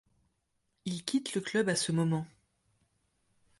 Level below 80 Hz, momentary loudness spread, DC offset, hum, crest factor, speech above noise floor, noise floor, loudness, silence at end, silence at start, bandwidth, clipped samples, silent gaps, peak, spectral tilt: -72 dBFS; 11 LU; under 0.1%; none; 22 dB; 48 dB; -79 dBFS; -32 LUFS; 1.35 s; 0.85 s; 11.5 kHz; under 0.1%; none; -14 dBFS; -4.5 dB/octave